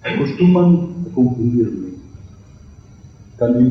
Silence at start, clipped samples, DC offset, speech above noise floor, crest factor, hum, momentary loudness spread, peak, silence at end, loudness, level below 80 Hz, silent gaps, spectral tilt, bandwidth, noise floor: 0.05 s; under 0.1%; under 0.1%; 27 dB; 14 dB; none; 15 LU; -4 dBFS; 0 s; -16 LUFS; -46 dBFS; none; -9.5 dB/octave; 6.2 kHz; -41 dBFS